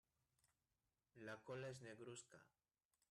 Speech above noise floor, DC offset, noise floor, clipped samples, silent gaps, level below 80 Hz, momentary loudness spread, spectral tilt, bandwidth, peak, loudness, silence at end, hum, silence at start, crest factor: over 33 dB; under 0.1%; under -90 dBFS; under 0.1%; none; under -90 dBFS; 7 LU; -4.5 dB/octave; 12.5 kHz; -42 dBFS; -56 LUFS; 0.65 s; none; 1.15 s; 18 dB